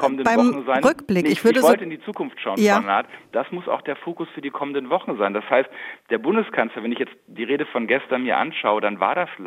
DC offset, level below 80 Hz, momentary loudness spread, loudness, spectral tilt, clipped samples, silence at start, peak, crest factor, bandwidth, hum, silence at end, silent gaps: under 0.1%; -66 dBFS; 12 LU; -21 LUFS; -5 dB/octave; under 0.1%; 0 s; -2 dBFS; 20 dB; 16 kHz; none; 0 s; none